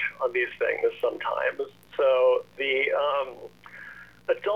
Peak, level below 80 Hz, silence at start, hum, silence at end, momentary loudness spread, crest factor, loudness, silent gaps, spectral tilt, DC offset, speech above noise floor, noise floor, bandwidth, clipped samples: -12 dBFS; -68 dBFS; 0 s; none; 0 s; 20 LU; 14 dB; -26 LUFS; none; -4.5 dB/octave; 0.1%; 20 dB; -46 dBFS; 6 kHz; under 0.1%